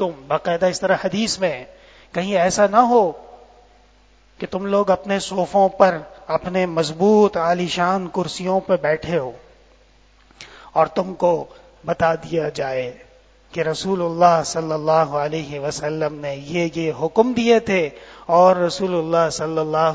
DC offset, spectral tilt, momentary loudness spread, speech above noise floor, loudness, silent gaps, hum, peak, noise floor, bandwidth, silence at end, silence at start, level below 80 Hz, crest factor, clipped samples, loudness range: under 0.1%; -5 dB/octave; 11 LU; 34 dB; -19 LUFS; none; none; 0 dBFS; -53 dBFS; 8 kHz; 0 s; 0 s; -52 dBFS; 20 dB; under 0.1%; 5 LU